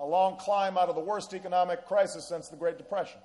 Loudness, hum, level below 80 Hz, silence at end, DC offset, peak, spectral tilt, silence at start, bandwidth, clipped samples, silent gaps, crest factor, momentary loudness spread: -30 LUFS; none; -74 dBFS; 0.05 s; under 0.1%; -14 dBFS; -4 dB/octave; 0 s; 11.5 kHz; under 0.1%; none; 14 dB; 8 LU